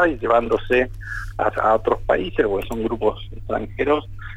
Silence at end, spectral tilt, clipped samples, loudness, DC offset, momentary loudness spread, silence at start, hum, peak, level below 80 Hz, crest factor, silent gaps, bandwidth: 0 s; -7 dB/octave; under 0.1%; -21 LUFS; under 0.1%; 9 LU; 0 s; none; -4 dBFS; -36 dBFS; 16 dB; none; 15 kHz